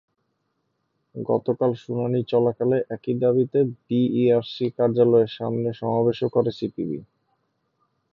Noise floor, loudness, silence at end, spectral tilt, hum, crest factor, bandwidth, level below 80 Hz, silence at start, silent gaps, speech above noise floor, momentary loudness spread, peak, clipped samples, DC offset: -74 dBFS; -23 LUFS; 1.1 s; -9.5 dB/octave; none; 18 dB; 5.8 kHz; -66 dBFS; 1.15 s; none; 52 dB; 9 LU; -6 dBFS; under 0.1%; under 0.1%